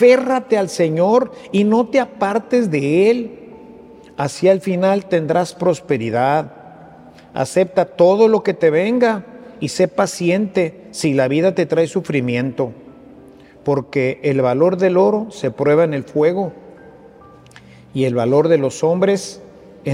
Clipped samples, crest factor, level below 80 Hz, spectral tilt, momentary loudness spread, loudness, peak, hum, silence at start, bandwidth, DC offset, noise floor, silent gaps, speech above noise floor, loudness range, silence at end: under 0.1%; 16 dB; -60 dBFS; -6.5 dB/octave; 10 LU; -17 LUFS; 0 dBFS; none; 0 s; 13 kHz; under 0.1%; -43 dBFS; none; 27 dB; 3 LU; 0 s